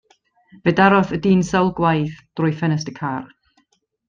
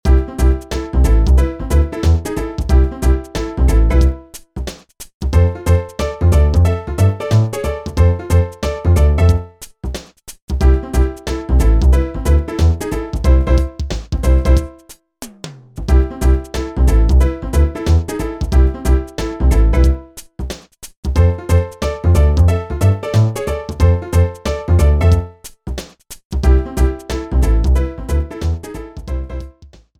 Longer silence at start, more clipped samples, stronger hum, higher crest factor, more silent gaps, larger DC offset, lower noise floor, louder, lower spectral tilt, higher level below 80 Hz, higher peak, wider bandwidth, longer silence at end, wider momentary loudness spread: first, 0.65 s vs 0.05 s; neither; neither; about the same, 18 dB vs 14 dB; second, none vs 5.14-5.20 s, 10.42-10.48 s, 20.97-21.03 s, 26.25-26.30 s; neither; first, -65 dBFS vs -43 dBFS; second, -19 LUFS vs -16 LUFS; about the same, -7 dB/octave vs -7 dB/octave; second, -50 dBFS vs -16 dBFS; about the same, -2 dBFS vs 0 dBFS; second, 7.4 kHz vs 13.5 kHz; first, 0.85 s vs 0.35 s; second, 12 LU vs 15 LU